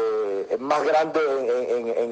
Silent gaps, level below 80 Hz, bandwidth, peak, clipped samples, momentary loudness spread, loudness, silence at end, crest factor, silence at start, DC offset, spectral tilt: none; -74 dBFS; 8.8 kHz; -8 dBFS; under 0.1%; 5 LU; -23 LUFS; 0 s; 14 dB; 0 s; under 0.1%; -4.5 dB/octave